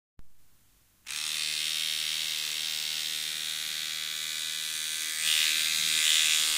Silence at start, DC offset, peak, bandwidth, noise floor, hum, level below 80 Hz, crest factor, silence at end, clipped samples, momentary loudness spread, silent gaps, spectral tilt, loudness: 0.2 s; under 0.1%; -10 dBFS; 16 kHz; -64 dBFS; none; -70 dBFS; 22 dB; 0 s; under 0.1%; 9 LU; none; 3 dB/octave; -27 LUFS